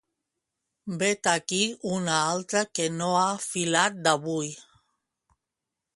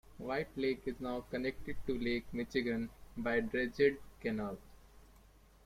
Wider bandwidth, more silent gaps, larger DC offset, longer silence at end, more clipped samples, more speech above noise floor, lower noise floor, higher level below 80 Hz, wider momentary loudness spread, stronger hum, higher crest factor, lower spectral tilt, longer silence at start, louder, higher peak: second, 11.5 kHz vs 16 kHz; neither; neither; first, 1.35 s vs 0.55 s; neither; first, 60 dB vs 26 dB; first, -86 dBFS vs -62 dBFS; second, -70 dBFS vs -56 dBFS; about the same, 9 LU vs 9 LU; neither; about the same, 24 dB vs 20 dB; second, -3 dB/octave vs -6.5 dB/octave; first, 0.85 s vs 0.05 s; first, -26 LUFS vs -38 LUFS; first, -4 dBFS vs -18 dBFS